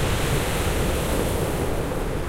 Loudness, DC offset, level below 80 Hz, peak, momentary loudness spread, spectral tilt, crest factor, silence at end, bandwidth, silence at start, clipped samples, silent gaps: -24 LUFS; under 0.1%; -30 dBFS; -8 dBFS; 3 LU; -5 dB/octave; 14 dB; 0 s; 16 kHz; 0 s; under 0.1%; none